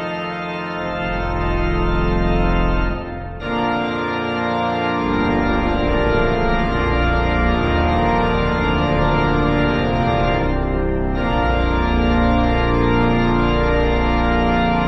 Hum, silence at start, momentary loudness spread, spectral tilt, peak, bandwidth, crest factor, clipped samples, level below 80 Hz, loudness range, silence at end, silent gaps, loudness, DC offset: none; 0 s; 5 LU; -8 dB/octave; -4 dBFS; 6.2 kHz; 14 dB; under 0.1%; -24 dBFS; 3 LU; 0 s; none; -19 LUFS; under 0.1%